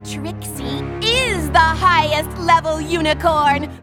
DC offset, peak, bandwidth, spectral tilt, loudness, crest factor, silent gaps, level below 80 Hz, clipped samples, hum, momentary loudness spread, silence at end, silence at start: under 0.1%; -2 dBFS; 17.5 kHz; -4 dB/octave; -16 LUFS; 16 dB; none; -34 dBFS; under 0.1%; none; 12 LU; 0 s; 0 s